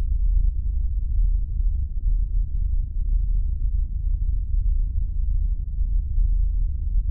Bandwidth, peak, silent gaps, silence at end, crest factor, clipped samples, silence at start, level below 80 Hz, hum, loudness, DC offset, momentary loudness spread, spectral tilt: 0.5 kHz; -12 dBFS; none; 0 s; 10 dB; under 0.1%; 0 s; -22 dBFS; none; -27 LUFS; under 0.1%; 3 LU; -19.5 dB/octave